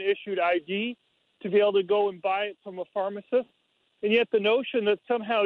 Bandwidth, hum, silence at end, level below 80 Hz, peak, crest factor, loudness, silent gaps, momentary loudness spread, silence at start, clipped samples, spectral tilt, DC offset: 4.5 kHz; none; 0 s; -76 dBFS; -10 dBFS; 16 dB; -26 LUFS; none; 11 LU; 0 s; under 0.1%; -7.5 dB/octave; under 0.1%